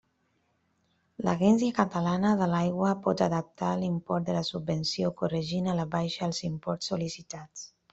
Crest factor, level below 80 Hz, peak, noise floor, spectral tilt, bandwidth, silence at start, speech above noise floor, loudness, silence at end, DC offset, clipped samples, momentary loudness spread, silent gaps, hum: 22 dB; -62 dBFS; -8 dBFS; -73 dBFS; -6 dB/octave; 8 kHz; 1.2 s; 45 dB; -29 LUFS; 0.25 s; under 0.1%; under 0.1%; 8 LU; none; none